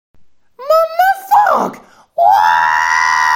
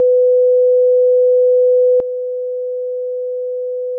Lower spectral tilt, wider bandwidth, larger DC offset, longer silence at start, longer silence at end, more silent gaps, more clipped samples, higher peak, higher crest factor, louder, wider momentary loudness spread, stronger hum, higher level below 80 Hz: second, -2 dB/octave vs -8.5 dB/octave; first, 17 kHz vs 0.9 kHz; neither; first, 0.6 s vs 0 s; about the same, 0 s vs 0 s; neither; neither; first, 0 dBFS vs -8 dBFS; first, 12 dB vs 6 dB; about the same, -12 LUFS vs -14 LUFS; about the same, 9 LU vs 10 LU; second, none vs 50 Hz at -80 dBFS; first, -58 dBFS vs -66 dBFS